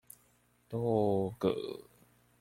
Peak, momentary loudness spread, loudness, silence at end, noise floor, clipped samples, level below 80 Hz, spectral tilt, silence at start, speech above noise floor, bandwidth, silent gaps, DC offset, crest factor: -16 dBFS; 13 LU; -33 LUFS; 0.6 s; -69 dBFS; under 0.1%; -66 dBFS; -8 dB/octave; 0.7 s; 37 dB; 16.5 kHz; none; under 0.1%; 18 dB